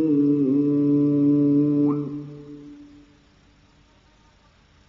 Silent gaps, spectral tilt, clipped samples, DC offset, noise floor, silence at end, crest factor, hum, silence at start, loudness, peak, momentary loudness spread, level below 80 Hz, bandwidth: none; -11.5 dB/octave; under 0.1%; under 0.1%; -56 dBFS; 2.05 s; 12 dB; none; 0 s; -20 LUFS; -12 dBFS; 21 LU; -62 dBFS; 2.9 kHz